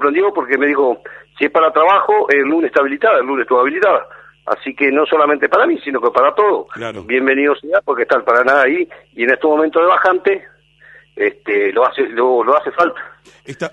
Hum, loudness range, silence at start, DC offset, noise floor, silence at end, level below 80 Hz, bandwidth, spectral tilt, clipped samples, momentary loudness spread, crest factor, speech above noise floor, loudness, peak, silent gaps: none; 2 LU; 0 s; under 0.1%; -45 dBFS; 0.05 s; -62 dBFS; 8.2 kHz; -5.5 dB/octave; under 0.1%; 9 LU; 14 dB; 31 dB; -14 LUFS; 0 dBFS; none